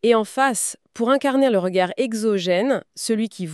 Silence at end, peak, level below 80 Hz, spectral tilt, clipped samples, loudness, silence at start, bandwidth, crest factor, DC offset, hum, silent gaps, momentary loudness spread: 0 s; -4 dBFS; -76 dBFS; -4 dB/octave; under 0.1%; -21 LUFS; 0.05 s; 13.5 kHz; 16 dB; under 0.1%; none; none; 6 LU